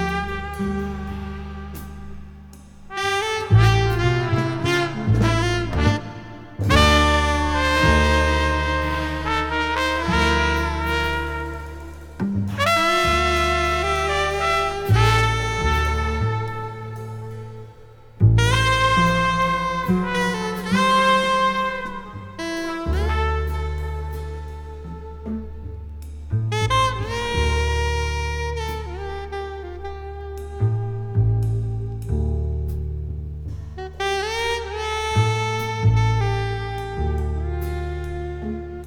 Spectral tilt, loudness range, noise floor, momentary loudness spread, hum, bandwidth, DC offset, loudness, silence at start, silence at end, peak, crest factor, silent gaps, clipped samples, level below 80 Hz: -5.5 dB/octave; 8 LU; -44 dBFS; 17 LU; none; 17 kHz; under 0.1%; -21 LUFS; 0 s; 0 s; 0 dBFS; 22 dB; none; under 0.1%; -30 dBFS